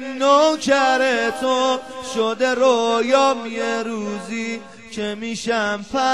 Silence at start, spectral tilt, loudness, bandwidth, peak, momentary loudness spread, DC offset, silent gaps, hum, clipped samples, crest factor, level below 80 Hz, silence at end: 0 s; -3 dB/octave; -19 LUFS; 12.5 kHz; -2 dBFS; 11 LU; 0.3%; none; none; under 0.1%; 16 dB; -60 dBFS; 0 s